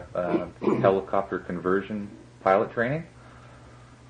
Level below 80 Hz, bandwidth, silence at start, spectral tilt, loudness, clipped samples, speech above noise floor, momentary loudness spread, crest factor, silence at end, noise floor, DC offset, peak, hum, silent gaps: -58 dBFS; 9.6 kHz; 0 s; -8 dB/octave; -26 LUFS; under 0.1%; 23 dB; 12 LU; 20 dB; 0.15 s; -49 dBFS; under 0.1%; -8 dBFS; none; none